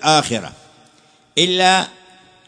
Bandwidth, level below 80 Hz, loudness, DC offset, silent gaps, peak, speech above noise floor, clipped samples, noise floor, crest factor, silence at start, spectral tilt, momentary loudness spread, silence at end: 10.5 kHz; -60 dBFS; -16 LUFS; under 0.1%; none; 0 dBFS; 37 dB; under 0.1%; -53 dBFS; 18 dB; 0 s; -2.5 dB/octave; 14 LU; 0.6 s